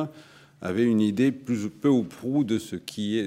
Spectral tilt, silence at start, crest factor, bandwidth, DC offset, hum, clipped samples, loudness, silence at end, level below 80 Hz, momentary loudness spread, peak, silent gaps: -6.5 dB/octave; 0 s; 14 dB; 15.5 kHz; under 0.1%; none; under 0.1%; -26 LUFS; 0 s; -70 dBFS; 11 LU; -12 dBFS; none